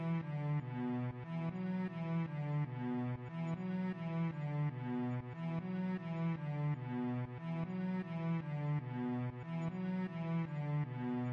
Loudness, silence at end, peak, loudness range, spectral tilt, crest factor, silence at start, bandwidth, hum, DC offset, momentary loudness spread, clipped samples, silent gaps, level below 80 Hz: -40 LUFS; 0 s; -30 dBFS; 1 LU; -10 dB/octave; 10 dB; 0 s; 5.2 kHz; none; under 0.1%; 3 LU; under 0.1%; none; -70 dBFS